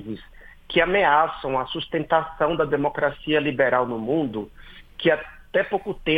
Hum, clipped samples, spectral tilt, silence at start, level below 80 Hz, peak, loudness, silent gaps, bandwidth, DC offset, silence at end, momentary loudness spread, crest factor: none; under 0.1%; -7.5 dB/octave; 0 s; -48 dBFS; -4 dBFS; -23 LUFS; none; 15.5 kHz; under 0.1%; 0 s; 10 LU; 18 dB